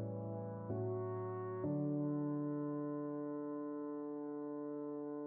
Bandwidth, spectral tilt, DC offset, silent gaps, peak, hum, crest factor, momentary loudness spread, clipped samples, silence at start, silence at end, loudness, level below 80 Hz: 2.3 kHz; -8.5 dB/octave; under 0.1%; none; -28 dBFS; none; 14 dB; 6 LU; under 0.1%; 0 s; 0 s; -42 LUFS; -80 dBFS